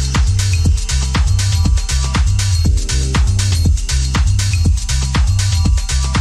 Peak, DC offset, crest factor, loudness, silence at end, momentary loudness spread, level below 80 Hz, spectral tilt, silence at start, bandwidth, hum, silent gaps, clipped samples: -2 dBFS; under 0.1%; 12 dB; -15 LUFS; 0 s; 2 LU; -16 dBFS; -4 dB/octave; 0 s; 14 kHz; none; none; under 0.1%